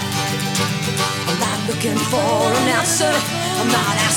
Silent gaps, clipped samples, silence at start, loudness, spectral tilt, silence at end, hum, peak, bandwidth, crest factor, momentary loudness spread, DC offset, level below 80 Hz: none; under 0.1%; 0 s; -18 LUFS; -3.5 dB/octave; 0 s; none; -4 dBFS; over 20 kHz; 16 dB; 4 LU; under 0.1%; -52 dBFS